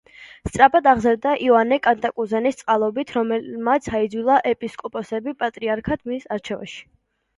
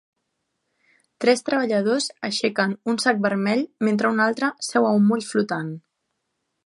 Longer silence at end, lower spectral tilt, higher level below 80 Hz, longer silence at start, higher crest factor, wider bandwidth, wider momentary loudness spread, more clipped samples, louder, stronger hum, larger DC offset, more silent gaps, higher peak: second, 0.55 s vs 0.85 s; about the same, -5.5 dB/octave vs -4.5 dB/octave; first, -50 dBFS vs -74 dBFS; second, 0.2 s vs 1.2 s; about the same, 20 dB vs 18 dB; about the same, 11.5 kHz vs 11.5 kHz; first, 13 LU vs 6 LU; neither; about the same, -20 LUFS vs -22 LUFS; neither; neither; neither; first, 0 dBFS vs -4 dBFS